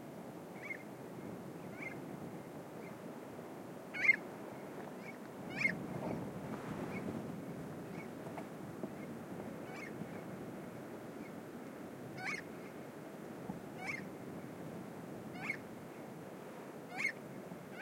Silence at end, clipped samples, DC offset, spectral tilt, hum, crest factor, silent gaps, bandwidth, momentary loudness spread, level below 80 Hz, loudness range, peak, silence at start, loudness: 0 s; under 0.1%; under 0.1%; -5.5 dB/octave; none; 26 dB; none; 16.5 kHz; 12 LU; -76 dBFS; 9 LU; -18 dBFS; 0 s; -43 LUFS